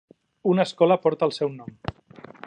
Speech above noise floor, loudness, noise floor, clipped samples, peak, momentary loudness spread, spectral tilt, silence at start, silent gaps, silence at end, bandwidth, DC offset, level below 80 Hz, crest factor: 25 dB; -23 LUFS; -47 dBFS; under 0.1%; -6 dBFS; 17 LU; -7 dB/octave; 0.45 s; none; 0.55 s; 10 kHz; under 0.1%; -56 dBFS; 18 dB